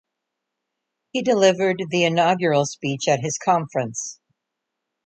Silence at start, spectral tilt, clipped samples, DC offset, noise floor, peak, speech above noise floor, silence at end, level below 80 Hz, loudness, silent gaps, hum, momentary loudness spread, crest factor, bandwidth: 1.15 s; -4.5 dB/octave; under 0.1%; under 0.1%; -81 dBFS; -4 dBFS; 61 dB; 0.95 s; -68 dBFS; -21 LUFS; none; none; 10 LU; 18 dB; 9 kHz